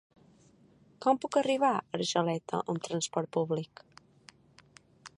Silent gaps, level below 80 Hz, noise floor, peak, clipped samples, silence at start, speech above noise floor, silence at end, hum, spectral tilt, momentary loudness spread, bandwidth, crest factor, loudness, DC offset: none; -76 dBFS; -62 dBFS; -12 dBFS; under 0.1%; 1 s; 32 dB; 0.1 s; none; -4.5 dB/octave; 7 LU; 11.5 kHz; 20 dB; -31 LUFS; under 0.1%